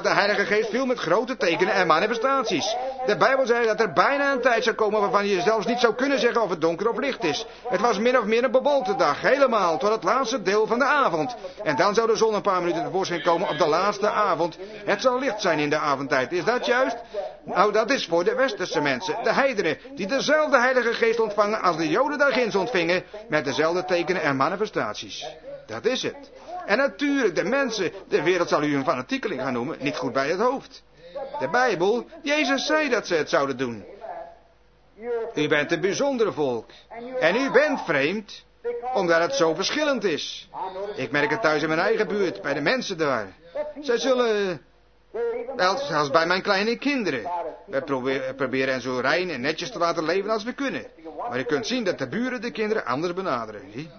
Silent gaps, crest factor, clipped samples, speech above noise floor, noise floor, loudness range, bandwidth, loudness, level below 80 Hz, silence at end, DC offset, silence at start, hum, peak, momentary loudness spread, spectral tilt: none; 20 dB; under 0.1%; 35 dB; -58 dBFS; 4 LU; 6.6 kHz; -23 LUFS; -62 dBFS; 0 s; under 0.1%; 0 s; none; -2 dBFS; 10 LU; -4 dB/octave